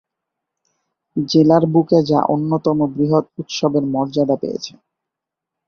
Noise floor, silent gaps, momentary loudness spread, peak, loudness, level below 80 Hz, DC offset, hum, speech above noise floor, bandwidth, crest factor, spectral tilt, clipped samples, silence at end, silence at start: -83 dBFS; none; 13 LU; -2 dBFS; -17 LUFS; -58 dBFS; under 0.1%; none; 67 dB; 6.8 kHz; 16 dB; -7 dB/octave; under 0.1%; 1 s; 1.15 s